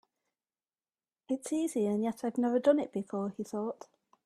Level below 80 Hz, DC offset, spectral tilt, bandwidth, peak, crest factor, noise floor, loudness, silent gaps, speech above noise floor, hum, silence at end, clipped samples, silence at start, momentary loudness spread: -78 dBFS; under 0.1%; -6 dB/octave; 13.5 kHz; -14 dBFS; 20 dB; under -90 dBFS; -32 LUFS; none; over 58 dB; none; 0.4 s; under 0.1%; 1.3 s; 10 LU